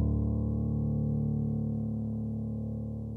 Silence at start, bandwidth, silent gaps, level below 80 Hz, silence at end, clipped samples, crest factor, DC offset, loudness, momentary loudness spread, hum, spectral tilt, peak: 0 s; 1.2 kHz; none; -40 dBFS; 0 s; under 0.1%; 14 dB; under 0.1%; -32 LUFS; 5 LU; none; -13.5 dB/octave; -18 dBFS